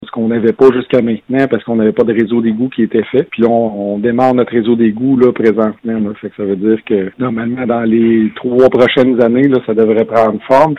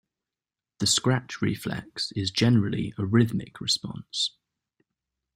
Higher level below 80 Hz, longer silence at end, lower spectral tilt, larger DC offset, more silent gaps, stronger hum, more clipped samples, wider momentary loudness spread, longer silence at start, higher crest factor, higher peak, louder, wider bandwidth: first, -50 dBFS vs -58 dBFS; second, 0 s vs 1.1 s; first, -8.5 dB/octave vs -4.5 dB/octave; neither; neither; neither; first, 0.3% vs under 0.1%; about the same, 7 LU vs 9 LU; second, 0 s vs 0.8 s; second, 12 dB vs 20 dB; first, 0 dBFS vs -8 dBFS; first, -12 LUFS vs -26 LUFS; second, 6.6 kHz vs 16 kHz